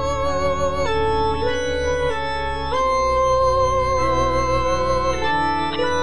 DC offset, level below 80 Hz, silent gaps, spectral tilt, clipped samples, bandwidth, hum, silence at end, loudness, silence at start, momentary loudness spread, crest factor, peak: 3%; -32 dBFS; none; -5 dB/octave; under 0.1%; 10.5 kHz; none; 0 s; -20 LUFS; 0 s; 4 LU; 12 dB; -8 dBFS